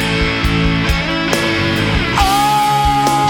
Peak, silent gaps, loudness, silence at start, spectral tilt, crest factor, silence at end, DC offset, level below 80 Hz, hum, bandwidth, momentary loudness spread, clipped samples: 0 dBFS; none; -14 LUFS; 0 s; -4.5 dB/octave; 14 dB; 0 s; under 0.1%; -24 dBFS; none; over 20 kHz; 3 LU; under 0.1%